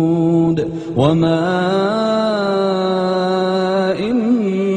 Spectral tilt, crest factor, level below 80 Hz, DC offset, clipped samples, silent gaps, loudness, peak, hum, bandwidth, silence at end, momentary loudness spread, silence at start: -7.5 dB/octave; 14 dB; -50 dBFS; under 0.1%; under 0.1%; none; -16 LUFS; -2 dBFS; none; 9.4 kHz; 0 s; 3 LU; 0 s